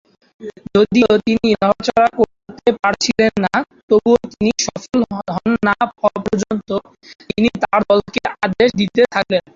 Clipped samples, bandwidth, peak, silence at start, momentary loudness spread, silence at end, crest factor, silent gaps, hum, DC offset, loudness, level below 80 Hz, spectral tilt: under 0.1%; 7.6 kHz; -2 dBFS; 0.4 s; 8 LU; 0.15 s; 14 dB; 3.83-3.88 s; none; under 0.1%; -16 LUFS; -46 dBFS; -4.5 dB/octave